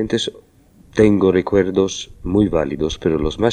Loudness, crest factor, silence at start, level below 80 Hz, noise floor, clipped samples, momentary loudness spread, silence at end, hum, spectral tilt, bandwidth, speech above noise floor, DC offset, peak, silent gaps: -18 LUFS; 18 dB; 0 s; -36 dBFS; -49 dBFS; under 0.1%; 8 LU; 0 s; none; -6 dB/octave; 9.6 kHz; 32 dB; under 0.1%; 0 dBFS; none